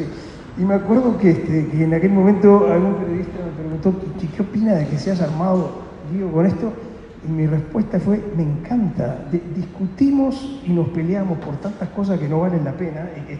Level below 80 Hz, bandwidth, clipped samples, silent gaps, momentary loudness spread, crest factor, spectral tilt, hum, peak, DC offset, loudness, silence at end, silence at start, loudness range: -44 dBFS; 7.6 kHz; under 0.1%; none; 13 LU; 18 dB; -9.5 dB/octave; none; 0 dBFS; under 0.1%; -19 LUFS; 0 s; 0 s; 5 LU